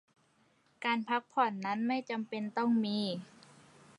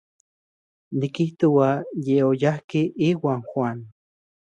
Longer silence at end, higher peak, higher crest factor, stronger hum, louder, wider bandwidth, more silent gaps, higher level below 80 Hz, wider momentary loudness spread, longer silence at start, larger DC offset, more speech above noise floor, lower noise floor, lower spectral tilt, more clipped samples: first, 0.75 s vs 0.6 s; second, -16 dBFS vs -6 dBFS; about the same, 18 dB vs 16 dB; neither; second, -34 LUFS vs -23 LUFS; first, 11 kHz vs 8.8 kHz; second, none vs 2.64-2.68 s; second, -84 dBFS vs -68 dBFS; about the same, 7 LU vs 9 LU; about the same, 0.8 s vs 0.9 s; neither; second, 37 dB vs over 68 dB; second, -70 dBFS vs under -90 dBFS; second, -6 dB/octave vs -8 dB/octave; neither